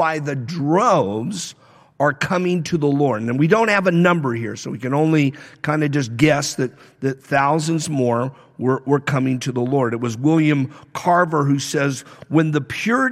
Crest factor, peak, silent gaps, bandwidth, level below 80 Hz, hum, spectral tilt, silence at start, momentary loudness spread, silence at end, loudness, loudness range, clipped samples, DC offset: 16 dB; -2 dBFS; none; 14.5 kHz; -60 dBFS; none; -6 dB/octave; 0 s; 10 LU; 0 s; -19 LUFS; 2 LU; under 0.1%; under 0.1%